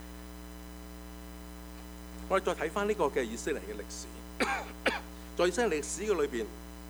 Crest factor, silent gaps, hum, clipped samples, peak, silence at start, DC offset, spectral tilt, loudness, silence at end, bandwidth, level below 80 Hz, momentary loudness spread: 22 dB; none; none; under 0.1%; -12 dBFS; 0 s; under 0.1%; -4 dB/octave; -33 LUFS; 0 s; over 20 kHz; -48 dBFS; 16 LU